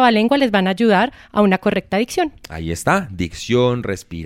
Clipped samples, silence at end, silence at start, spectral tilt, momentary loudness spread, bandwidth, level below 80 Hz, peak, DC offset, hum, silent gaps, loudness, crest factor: under 0.1%; 0 s; 0 s; -5.5 dB/octave; 10 LU; 16 kHz; -42 dBFS; -2 dBFS; under 0.1%; none; none; -18 LUFS; 16 dB